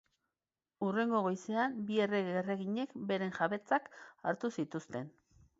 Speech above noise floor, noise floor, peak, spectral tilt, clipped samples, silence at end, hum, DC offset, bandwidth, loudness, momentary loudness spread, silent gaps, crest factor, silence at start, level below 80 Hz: over 55 dB; under -90 dBFS; -18 dBFS; -4.5 dB/octave; under 0.1%; 0.5 s; none; under 0.1%; 7.6 kHz; -36 LUFS; 9 LU; none; 18 dB; 0.8 s; -78 dBFS